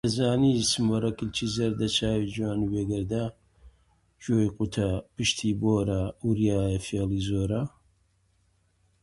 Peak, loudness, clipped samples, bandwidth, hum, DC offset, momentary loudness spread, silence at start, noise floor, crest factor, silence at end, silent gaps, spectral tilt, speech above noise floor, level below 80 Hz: -12 dBFS; -27 LUFS; under 0.1%; 11.5 kHz; none; under 0.1%; 6 LU; 0.05 s; -68 dBFS; 16 dB; 1.35 s; none; -5.5 dB/octave; 41 dB; -46 dBFS